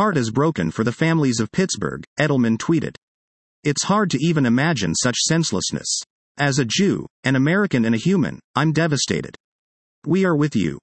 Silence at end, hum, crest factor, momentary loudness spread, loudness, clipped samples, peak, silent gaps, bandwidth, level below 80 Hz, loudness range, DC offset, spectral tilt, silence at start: 0.05 s; none; 16 dB; 6 LU; -20 LUFS; under 0.1%; -4 dBFS; 2.07-2.16 s, 2.98-3.63 s, 6.10-6.35 s, 7.10-7.23 s, 8.44-8.54 s, 9.40-10.02 s; 8.8 kHz; -56 dBFS; 2 LU; under 0.1%; -4.5 dB/octave; 0 s